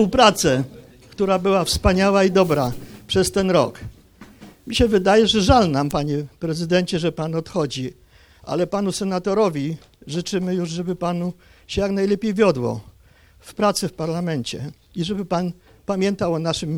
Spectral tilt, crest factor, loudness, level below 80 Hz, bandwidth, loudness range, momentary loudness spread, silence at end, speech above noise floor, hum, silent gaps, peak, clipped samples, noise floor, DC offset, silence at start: -5 dB/octave; 20 dB; -20 LUFS; -40 dBFS; over 20 kHz; 5 LU; 14 LU; 0 s; 32 dB; none; none; 0 dBFS; under 0.1%; -52 dBFS; under 0.1%; 0 s